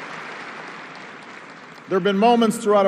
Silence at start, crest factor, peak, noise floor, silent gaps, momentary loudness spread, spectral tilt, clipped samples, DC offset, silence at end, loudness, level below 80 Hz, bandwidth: 0 s; 16 dB; -4 dBFS; -41 dBFS; none; 22 LU; -5.5 dB/octave; under 0.1%; under 0.1%; 0 s; -19 LUFS; -72 dBFS; 14 kHz